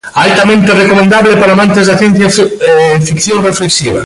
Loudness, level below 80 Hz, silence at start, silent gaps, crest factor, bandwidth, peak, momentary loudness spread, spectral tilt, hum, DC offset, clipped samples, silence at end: -7 LUFS; -40 dBFS; 0.05 s; none; 6 dB; 11.5 kHz; 0 dBFS; 4 LU; -4.5 dB/octave; none; under 0.1%; under 0.1%; 0 s